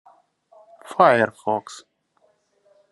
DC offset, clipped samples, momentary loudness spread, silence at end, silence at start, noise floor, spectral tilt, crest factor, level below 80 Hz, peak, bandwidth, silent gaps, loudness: under 0.1%; under 0.1%; 24 LU; 1.1 s; 0.9 s; -65 dBFS; -5.5 dB/octave; 22 dB; -74 dBFS; -2 dBFS; 12 kHz; none; -20 LUFS